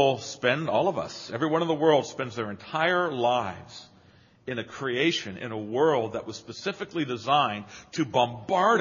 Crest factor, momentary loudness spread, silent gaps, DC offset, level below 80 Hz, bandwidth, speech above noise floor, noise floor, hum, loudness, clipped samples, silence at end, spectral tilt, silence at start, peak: 20 dB; 12 LU; none; under 0.1%; -68 dBFS; 7.2 kHz; 31 dB; -57 dBFS; none; -27 LUFS; under 0.1%; 0 s; -3 dB/octave; 0 s; -8 dBFS